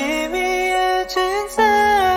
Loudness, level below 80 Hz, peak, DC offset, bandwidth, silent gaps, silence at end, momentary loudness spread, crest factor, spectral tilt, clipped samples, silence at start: -18 LUFS; -42 dBFS; -4 dBFS; under 0.1%; 16.5 kHz; none; 0 s; 6 LU; 14 dB; -2.5 dB/octave; under 0.1%; 0 s